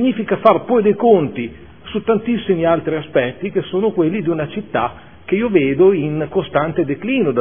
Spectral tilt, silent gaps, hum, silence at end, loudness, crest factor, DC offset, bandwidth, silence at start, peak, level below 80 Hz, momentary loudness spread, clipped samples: -11 dB/octave; none; none; 0 s; -17 LUFS; 16 dB; 0.6%; 3.6 kHz; 0 s; 0 dBFS; -48 dBFS; 10 LU; under 0.1%